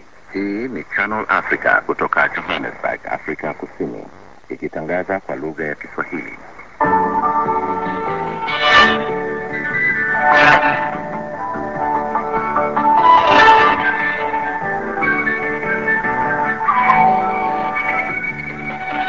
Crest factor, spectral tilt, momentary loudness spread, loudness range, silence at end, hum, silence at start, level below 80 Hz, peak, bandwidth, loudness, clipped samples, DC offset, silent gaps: 18 dB; -5 dB/octave; 15 LU; 10 LU; 0 s; none; 0.3 s; -48 dBFS; 0 dBFS; 7.6 kHz; -16 LUFS; under 0.1%; 0.8%; none